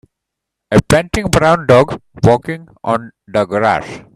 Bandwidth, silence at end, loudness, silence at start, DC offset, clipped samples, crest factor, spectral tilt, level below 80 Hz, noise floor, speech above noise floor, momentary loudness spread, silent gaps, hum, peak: 15 kHz; 0.15 s; -14 LUFS; 0.7 s; under 0.1%; under 0.1%; 14 dB; -6 dB/octave; -36 dBFS; -79 dBFS; 65 dB; 9 LU; none; none; 0 dBFS